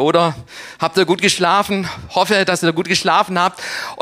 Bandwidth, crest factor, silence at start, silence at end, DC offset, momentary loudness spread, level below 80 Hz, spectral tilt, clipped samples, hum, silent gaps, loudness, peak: 16 kHz; 16 dB; 0 s; 0 s; under 0.1%; 9 LU; -52 dBFS; -3.5 dB/octave; under 0.1%; none; none; -16 LUFS; -2 dBFS